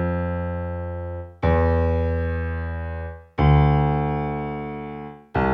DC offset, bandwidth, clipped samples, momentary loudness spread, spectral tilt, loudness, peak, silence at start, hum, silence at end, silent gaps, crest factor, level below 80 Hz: under 0.1%; 5.4 kHz; under 0.1%; 14 LU; -10 dB/octave; -23 LUFS; -6 dBFS; 0 s; none; 0 s; none; 16 dB; -30 dBFS